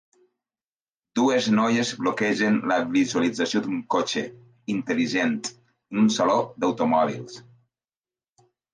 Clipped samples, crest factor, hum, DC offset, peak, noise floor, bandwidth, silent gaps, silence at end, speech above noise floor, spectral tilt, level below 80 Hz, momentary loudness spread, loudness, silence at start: under 0.1%; 16 dB; none; under 0.1%; -8 dBFS; under -90 dBFS; 9.8 kHz; none; 1.35 s; over 67 dB; -4.5 dB/octave; -70 dBFS; 11 LU; -23 LUFS; 1.15 s